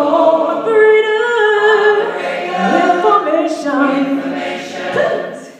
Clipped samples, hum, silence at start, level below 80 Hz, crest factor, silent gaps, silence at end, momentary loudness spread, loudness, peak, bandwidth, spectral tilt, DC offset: under 0.1%; none; 0 s; -66 dBFS; 14 dB; none; 0 s; 9 LU; -13 LUFS; 0 dBFS; 9.4 kHz; -5 dB/octave; under 0.1%